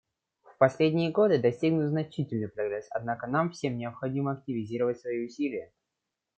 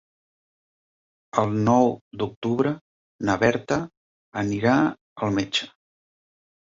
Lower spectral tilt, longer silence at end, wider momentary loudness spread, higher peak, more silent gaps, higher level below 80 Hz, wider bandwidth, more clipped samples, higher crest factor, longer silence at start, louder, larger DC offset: first, -7.5 dB/octave vs -6 dB/octave; second, 0.75 s vs 0.95 s; about the same, 10 LU vs 11 LU; second, -8 dBFS vs -4 dBFS; second, none vs 2.01-2.11 s, 2.36-2.42 s, 2.81-3.19 s, 3.97-4.32 s, 5.01-5.16 s; second, -70 dBFS vs -56 dBFS; first, 8.8 kHz vs 7.8 kHz; neither; about the same, 22 dB vs 22 dB; second, 0.45 s vs 1.35 s; second, -29 LUFS vs -24 LUFS; neither